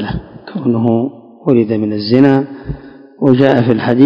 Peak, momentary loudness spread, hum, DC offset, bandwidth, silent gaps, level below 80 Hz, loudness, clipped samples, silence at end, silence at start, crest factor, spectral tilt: 0 dBFS; 16 LU; none; under 0.1%; 5.4 kHz; none; -40 dBFS; -13 LUFS; 0.9%; 0 s; 0 s; 12 dB; -9.5 dB/octave